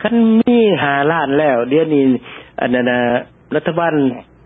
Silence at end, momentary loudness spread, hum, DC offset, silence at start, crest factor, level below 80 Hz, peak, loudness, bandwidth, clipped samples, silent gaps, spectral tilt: 0.25 s; 9 LU; none; under 0.1%; 0 s; 12 dB; -52 dBFS; -2 dBFS; -15 LUFS; 3.9 kHz; under 0.1%; none; -10.5 dB/octave